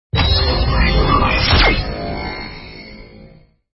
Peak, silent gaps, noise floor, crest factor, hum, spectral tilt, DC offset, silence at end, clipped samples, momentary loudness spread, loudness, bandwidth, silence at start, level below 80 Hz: 0 dBFS; none; -45 dBFS; 16 dB; none; -8.5 dB/octave; under 0.1%; 0.5 s; under 0.1%; 21 LU; -15 LUFS; 5.8 kHz; 0.15 s; -20 dBFS